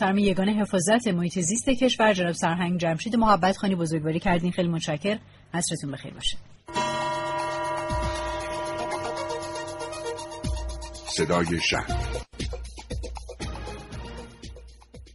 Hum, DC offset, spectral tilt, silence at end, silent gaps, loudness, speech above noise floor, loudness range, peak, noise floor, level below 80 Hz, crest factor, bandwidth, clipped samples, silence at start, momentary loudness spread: none; under 0.1%; -4.5 dB/octave; 0 s; none; -26 LUFS; 22 dB; 8 LU; -6 dBFS; -46 dBFS; -40 dBFS; 20 dB; 11.5 kHz; under 0.1%; 0 s; 15 LU